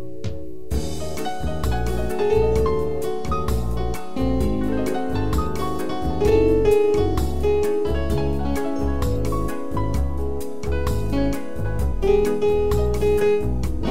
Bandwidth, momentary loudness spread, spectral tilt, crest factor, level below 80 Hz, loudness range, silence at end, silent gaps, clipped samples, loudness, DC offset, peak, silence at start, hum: 16 kHz; 9 LU; -7 dB/octave; 16 dB; -28 dBFS; 4 LU; 0 s; none; under 0.1%; -23 LUFS; 5%; -6 dBFS; 0 s; none